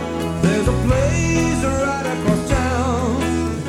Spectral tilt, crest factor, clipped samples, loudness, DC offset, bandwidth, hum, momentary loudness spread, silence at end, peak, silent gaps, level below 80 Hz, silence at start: -6 dB/octave; 16 dB; under 0.1%; -19 LUFS; under 0.1%; 16 kHz; none; 3 LU; 0 s; -2 dBFS; none; -28 dBFS; 0 s